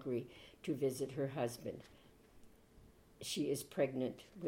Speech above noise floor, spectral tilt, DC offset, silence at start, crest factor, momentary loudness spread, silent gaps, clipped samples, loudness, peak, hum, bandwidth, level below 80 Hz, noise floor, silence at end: 23 dB; -5 dB/octave; under 0.1%; 0 s; 18 dB; 11 LU; none; under 0.1%; -41 LUFS; -24 dBFS; none; 16.5 kHz; -70 dBFS; -64 dBFS; 0 s